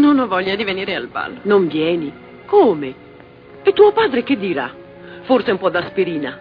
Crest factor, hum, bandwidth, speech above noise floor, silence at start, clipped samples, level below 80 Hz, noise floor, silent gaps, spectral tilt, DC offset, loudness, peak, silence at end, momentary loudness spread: 18 dB; none; 5 kHz; 25 dB; 0 s; under 0.1%; -56 dBFS; -41 dBFS; none; -8.5 dB/octave; under 0.1%; -17 LUFS; 0 dBFS; 0 s; 14 LU